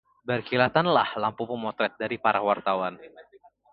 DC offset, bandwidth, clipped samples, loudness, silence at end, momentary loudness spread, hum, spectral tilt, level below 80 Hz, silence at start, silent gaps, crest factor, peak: under 0.1%; 5.4 kHz; under 0.1%; -26 LUFS; 0.5 s; 9 LU; none; -9.5 dB/octave; -66 dBFS; 0.25 s; none; 22 dB; -4 dBFS